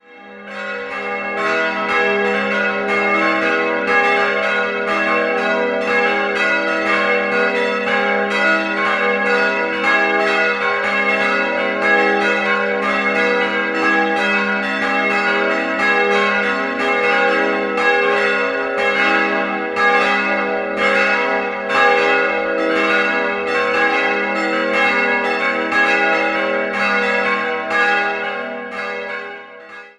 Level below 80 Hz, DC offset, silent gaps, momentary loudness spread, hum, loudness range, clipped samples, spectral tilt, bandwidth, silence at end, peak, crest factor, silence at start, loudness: -58 dBFS; under 0.1%; none; 5 LU; none; 1 LU; under 0.1%; -4 dB/octave; 11.5 kHz; 0.1 s; 0 dBFS; 16 dB; 0.1 s; -16 LUFS